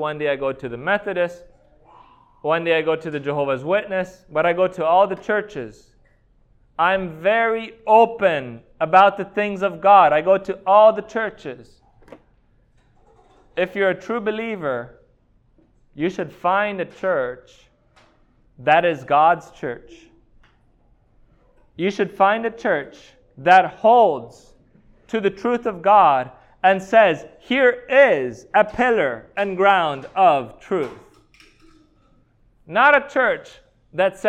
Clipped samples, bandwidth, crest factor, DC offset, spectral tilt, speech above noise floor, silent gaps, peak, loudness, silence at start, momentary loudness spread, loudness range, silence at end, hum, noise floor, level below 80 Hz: under 0.1%; 9 kHz; 18 dB; under 0.1%; -6 dB/octave; 40 dB; none; -2 dBFS; -19 LUFS; 0 s; 14 LU; 9 LU; 0 s; none; -58 dBFS; -56 dBFS